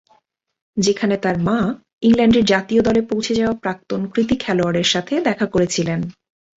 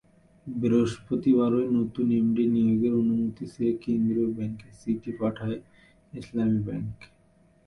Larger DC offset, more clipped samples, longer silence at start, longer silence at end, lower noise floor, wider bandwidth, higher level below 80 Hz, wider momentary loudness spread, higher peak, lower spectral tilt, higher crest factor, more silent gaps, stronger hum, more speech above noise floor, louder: neither; neither; first, 0.75 s vs 0.45 s; second, 0.45 s vs 0.6 s; about the same, -61 dBFS vs -61 dBFS; second, 8 kHz vs 9.2 kHz; first, -46 dBFS vs -58 dBFS; second, 9 LU vs 13 LU; first, -2 dBFS vs -12 dBFS; second, -5 dB/octave vs -8.5 dB/octave; about the same, 16 dB vs 14 dB; first, 1.93-1.98 s vs none; neither; first, 44 dB vs 35 dB; first, -18 LUFS vs -26 LUFS